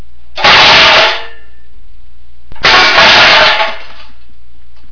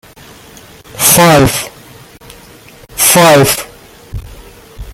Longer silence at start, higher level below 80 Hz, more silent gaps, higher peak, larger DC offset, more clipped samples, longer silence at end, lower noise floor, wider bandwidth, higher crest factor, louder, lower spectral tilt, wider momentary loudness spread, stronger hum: second, 0.35 s vs 0.95 s; about the same, -36 dBFS vs -34 dBFS; neither; about the same, 0 dBFS vs 0 dBFS; first, 10% vs under 0.1%; first, 4% vs 0.2%; first, 0.8 s vs 0 s; first, -43 dBFS vs -37 dBFS; second, 5.4 kHz vs over 20 kHz; about the same, 10 dB vs 12 dB; first, -4 LUFS vs -7 LUFS; second, -1.5 dB/octave vs -3.5 dB/octave; second, 12 LU vs 24 LU; neither